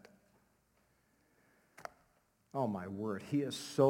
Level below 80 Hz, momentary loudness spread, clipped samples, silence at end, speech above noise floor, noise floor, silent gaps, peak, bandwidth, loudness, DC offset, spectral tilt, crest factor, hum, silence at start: -80 dBFS; 16 LU; under 0.1%; 0 s; 40 dB; -74 dBFS; none; -16 dBFS; 16.5 kHz; -39 LUFS; under 0.1%; -6 dB/octave; 22 dB; none; 1.8 s